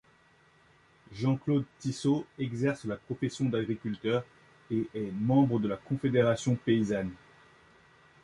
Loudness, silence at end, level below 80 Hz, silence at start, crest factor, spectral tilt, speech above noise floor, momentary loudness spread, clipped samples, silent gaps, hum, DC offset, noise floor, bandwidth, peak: -30 LUFS; 1.05 s; -62 dBFS; 1.1 s; 18 dB; -7 dB/octave; 34 dB; 9 LU; under 0.1%; none; none; under 0.1%; -63 dBFS; 11.5 kHz; -12 dBFS